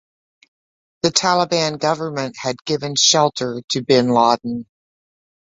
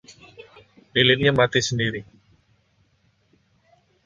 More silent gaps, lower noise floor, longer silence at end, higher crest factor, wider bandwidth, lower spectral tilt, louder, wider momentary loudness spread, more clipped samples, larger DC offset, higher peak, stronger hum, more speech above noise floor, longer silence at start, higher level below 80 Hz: first, 3.64-3.68 s vs none; first, under -90 dBFS vs -64 dBFS; second, 0.95 s vs 2.05 s; about the same, 20 dB vs 22 dB; second, 8 kHz vs 9.2 kHz; about the same, -3 dB/octave vs -4 dB/octave; about the same, -18 LUFS vs -20 LUFS; about the same, 11 LU vs 10 LU; neither; neither; about the same, 0 dBFS vs -2 dBFS; neither; first, over 72 dB vs 44 dB; first, 1.05 s vs 0.1 s; second, -60 dBFS vs -54 dBFS